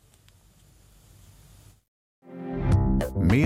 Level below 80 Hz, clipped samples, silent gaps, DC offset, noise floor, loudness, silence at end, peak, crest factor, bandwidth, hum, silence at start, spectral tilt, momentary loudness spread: -36 dBFS; under 0.1%; none; under 0.1%; -57 dBFS; -25 LUFS; 0 s; -8 dBFS; 18 dB; 16 kHz; none; 2.3 s; -8 dB/octave; 17 LU